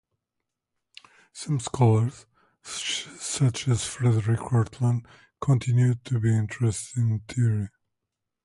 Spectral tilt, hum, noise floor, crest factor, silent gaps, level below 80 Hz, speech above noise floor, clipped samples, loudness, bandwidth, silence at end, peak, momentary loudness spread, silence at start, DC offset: -5.5 dB/octave; none; -84 dBFS; 16 dB; none; -54 dBFS; 60 dB; under 0.1%; -25 LUFS; 11.5 kHz; 0.75 s; -10 dBFS; 9 LU; 1.35 s; under 0.1%